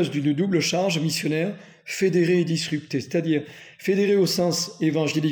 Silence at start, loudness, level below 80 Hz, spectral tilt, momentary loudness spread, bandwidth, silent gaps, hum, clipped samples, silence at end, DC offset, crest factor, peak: 0 s; -23 LUFS; -70 dBFS; -5 dB/octave; 8 LU; over 20 kHz; none; none; under 0.1%; 0 s; under 0.1%; 14 dB; -10 dBFS